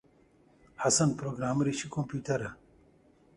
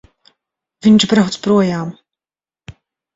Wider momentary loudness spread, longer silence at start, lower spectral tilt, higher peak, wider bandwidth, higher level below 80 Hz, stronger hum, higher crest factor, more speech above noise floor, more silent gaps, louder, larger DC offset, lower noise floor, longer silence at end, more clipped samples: second, 9 LU vs 12 LU; about the same, 0.8 s vs 0.85 s; about the same, -4.5 dB/octave vs -5.5 dB/octave; second, -14 dBFS vs 0 dBFS; first, 11.5 kHz vs 8 kHz; second, -62 dBFS vs -52 dBFS; neither; about the same, 18 dB vs 16 dB; second, 33 dB vs over 77 dB; neither; second, -30 LUFS vs -14 LUFS; neither; second, -63 dBFS vs under -90 dBFS; first, 0.85 s vs 0.45 s; neither